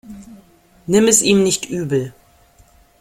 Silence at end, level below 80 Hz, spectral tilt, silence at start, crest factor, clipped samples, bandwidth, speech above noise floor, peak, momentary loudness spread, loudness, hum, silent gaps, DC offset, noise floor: 0.9 s; -52 dBFS; -3.5 dB/octave; 0.1 s; 18 dB; under 0.1%; 16.5 kHz; 36 dB; 0 dBFS; 22 LU; -15 LUFS; none; none; under 0.1%; -51 dBFS